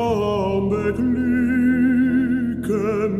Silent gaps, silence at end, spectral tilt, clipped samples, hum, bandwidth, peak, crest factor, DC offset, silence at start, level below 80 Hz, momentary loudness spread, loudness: none; 0 s; -8 dB/octave; under 0.1%; none; 12.5 kHz; -10 dBFS; 10 dB; under 0.1%; 0 s; -46 dBFS; 5 LU; -20 LUFS